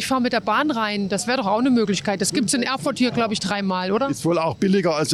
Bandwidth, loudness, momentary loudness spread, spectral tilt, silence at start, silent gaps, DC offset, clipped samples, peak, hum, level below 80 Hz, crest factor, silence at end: 13 kHz; -21 LUFS; 4 LU; -4.5 dB/octave; 0 s; none; under 0.1%; under 0.1%; -10 dBFS; none; -58 dBFS; 12 dB; 0 s